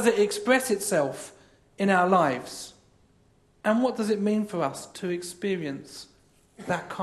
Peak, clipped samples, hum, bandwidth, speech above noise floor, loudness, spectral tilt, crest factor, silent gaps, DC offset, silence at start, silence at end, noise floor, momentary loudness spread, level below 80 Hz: -8 dBFS; under 0.1%; none; 13 kHz; 36 dB; -26 LUFS; -4.5 dB/octave; 20 dB; none; under 0.1%; 0 s; 0 s; -62 dBFS; 18 LU; -68 dBFS